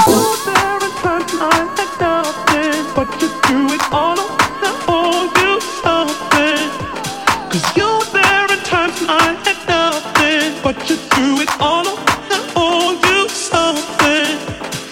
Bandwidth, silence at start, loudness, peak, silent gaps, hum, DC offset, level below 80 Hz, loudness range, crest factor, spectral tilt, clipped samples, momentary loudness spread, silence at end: 17 kHz; 0 s; -15 LUFS; 0 dBFS; none; none; under 0.1%; -44 dBFS; 2 LU; 16 dB; -3 dB/octave; under 0.1%; 5 LU; 0 s